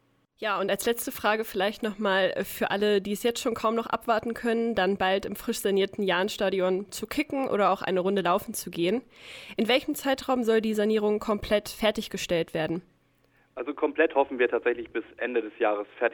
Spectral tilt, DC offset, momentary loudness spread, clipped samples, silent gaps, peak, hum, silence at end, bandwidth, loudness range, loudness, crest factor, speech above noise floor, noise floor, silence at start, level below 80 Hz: -4 dB/octave; under 0.1%; 7 LU; under 0.1%; none; -8 dBFS; none; 0 s; over 20 kHz; 2 LU; -27 LUFS; 18 dB; 38 dB; -65 dBFS; 0.4 s; -58 dBFS